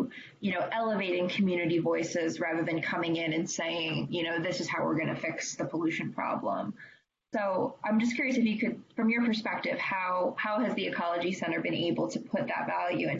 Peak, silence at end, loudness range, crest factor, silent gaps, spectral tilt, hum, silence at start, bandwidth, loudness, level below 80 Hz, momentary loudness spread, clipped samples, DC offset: -18 dBFS; 0 s; 3 LU; 12 dB; none; -5 dB/octave; none; 0 s; 8 kHz; -31 LUFS; -72 dBFS; 5 LU; under 0.1%; under 0.1%